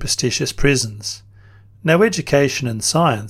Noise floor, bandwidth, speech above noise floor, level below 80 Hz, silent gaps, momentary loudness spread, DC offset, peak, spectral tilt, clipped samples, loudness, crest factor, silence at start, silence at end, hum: -45 dBFS; 16 kHz; 28 dB; -36 dBFS; none; 11 LU; under 0.1%; 0 dBFS; -4 dB/octave; under 0.1%; -18 LUFS; 18 dB; 0 s; 0 s; none